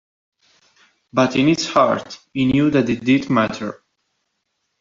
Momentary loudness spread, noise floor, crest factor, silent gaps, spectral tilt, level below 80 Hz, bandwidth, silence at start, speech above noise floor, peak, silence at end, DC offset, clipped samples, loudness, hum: 10 LU; -73 dBFS; 18 dB; none; -5.5 dB/octave; -52 dBFS; 7.6 kHz; 1.15 s; 56 dB; -2 dBFS; 1.05 s; under 0.1%; under 0.1%; -18 LUFS; none